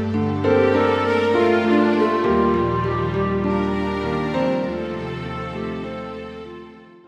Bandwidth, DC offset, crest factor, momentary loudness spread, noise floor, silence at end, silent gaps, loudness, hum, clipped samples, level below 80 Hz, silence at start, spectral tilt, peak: 9.8 kHz; under 0.1%; 16 dB; 14 LU; -41 dBFS; 0.2 s; none; -20 LUFS; none; under 0.1%; -42 dBFS; 0 s; -7.5 dB/octave; -6 dBFS